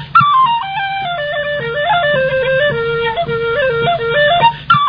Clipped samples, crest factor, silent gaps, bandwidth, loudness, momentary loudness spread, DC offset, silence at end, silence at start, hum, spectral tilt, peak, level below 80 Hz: under 0.1%; 14 dB; none; 5.2 kHz; -14 LUFS; 8 LU; 0.3%; 0 s; 0 s; none; -7 dB/octave; 0 dBFS; -42 dBFS